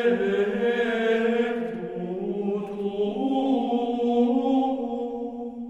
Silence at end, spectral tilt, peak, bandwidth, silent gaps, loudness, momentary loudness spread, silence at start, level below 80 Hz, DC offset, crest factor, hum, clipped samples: 0 s; -7 dB/octave; -10 dBFS; 8.2 kHz; none; -25 LUFS; 9 LU; 0 s; -62 dBFS; under 0.1%; 14 dB; none; under 0.1%